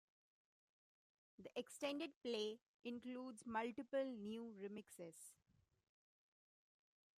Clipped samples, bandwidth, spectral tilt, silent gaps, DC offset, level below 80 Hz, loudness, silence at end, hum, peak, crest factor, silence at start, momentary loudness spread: under 0.1%; 15 kHz; -4 dB/octave; 2.16-2.21 s, 2.62-2.80 s; under 0.1%; under -90 dBFS; -49 LUFS; 1.85 s; none; -32 dBFS; 20 dB; 1.4 s; 12 LU